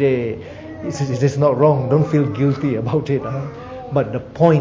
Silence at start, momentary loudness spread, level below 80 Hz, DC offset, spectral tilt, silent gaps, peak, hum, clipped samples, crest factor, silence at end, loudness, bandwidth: 0 s; 14 LU; -46 dBFS; under 0.1%; -8 dB/octave; none; -2 dBFS; none; under 0.1%; 16 dB; 0 s; -18 LUFS; 7.6 kHz